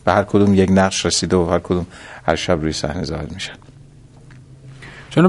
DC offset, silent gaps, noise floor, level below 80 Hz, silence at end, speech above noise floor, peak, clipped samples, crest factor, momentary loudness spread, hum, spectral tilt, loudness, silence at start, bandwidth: under 0.1%; none; -43 dBFS; -36 dBFS; 0 s; 26 dB; 0 dBFS; under 0.1%; 18 dB; 16 LU; none; -5 dB/octave; -18 LUFS; 0.05 s; 11.5 kHz